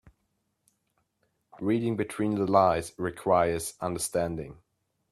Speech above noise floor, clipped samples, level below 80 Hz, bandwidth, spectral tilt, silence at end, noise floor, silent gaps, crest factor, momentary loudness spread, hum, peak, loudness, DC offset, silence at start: 50 dB; under 0.1%; -58 dBFS; 14.5 kHz; -5.5 dB/octave; 0.6 s; -77 dBFS; none; 22 dB; 12 LU; none; -8 dBFS; -28 LUFS; under 0.1%; 1.55 s